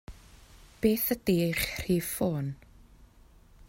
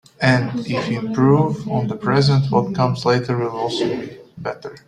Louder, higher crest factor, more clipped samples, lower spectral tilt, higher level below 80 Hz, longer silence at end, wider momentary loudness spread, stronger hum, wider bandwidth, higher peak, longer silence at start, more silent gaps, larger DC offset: second, -29 LUFS vs -19 LUFS; about the same, 20 dB vs 18 dB; neither; second, -5 dB/octave vs -7 dB/octave; about the same, -50 dBFS vs -52 dBFS; first, 0.65 s vs 0.1 s; second, 8 LU vs 13 LU; neither; first, 16.5 kHz vs 10 kHz; second, -12 dBFS vs -2 dBFS; about the same, 0.1 s vs 0.2 s; neither; neither